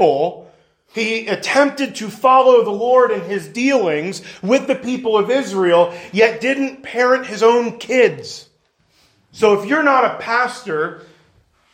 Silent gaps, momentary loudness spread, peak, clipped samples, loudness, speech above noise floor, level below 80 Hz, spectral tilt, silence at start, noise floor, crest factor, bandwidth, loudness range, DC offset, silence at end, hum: none; 10 LU; 0 dBFS; under 0.1%; -16 LUFS; 44 dB; -66 dBFS; -4.5 dB/octave; 0 s; -60 dBFS; 16 dB; 16 kHz; 3 LU; under 0.1%; 0.75 s; none